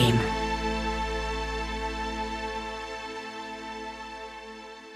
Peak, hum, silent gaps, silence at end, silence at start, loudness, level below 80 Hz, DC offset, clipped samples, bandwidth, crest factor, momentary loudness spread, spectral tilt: -10 dBFS; none; none; 0 s; 0 s; -32 LUFS; -40 dBFS; under 0.1%; under 0.1%; 15 kHz; 20 dB; 11 LU; -5 dB/octave